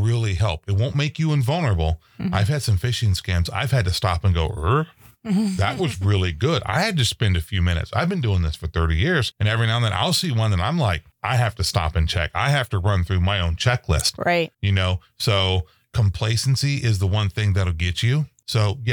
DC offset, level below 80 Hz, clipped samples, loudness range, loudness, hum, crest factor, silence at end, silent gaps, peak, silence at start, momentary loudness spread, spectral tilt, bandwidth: under 0.1%; -34 dBFS; under 0.1%; 1 LU; -21 LUFS; none; 16 dB; 0 s; none; -4 dBFS; 0 s; 4 LU; -5 dB/octave; 19 kHz